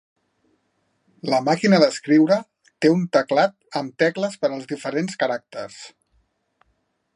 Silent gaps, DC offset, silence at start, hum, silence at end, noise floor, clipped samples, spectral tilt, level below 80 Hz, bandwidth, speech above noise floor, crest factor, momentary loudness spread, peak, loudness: none; under 0.1%; 1.25 s; none; 1.3 s; -70 dBFS; under 0.1%; -5.5 dB/octave; -72 dBFS; 11 kHz; 50 dB; 20 dB; 14 LU; -2 dBFS; -21 LUFS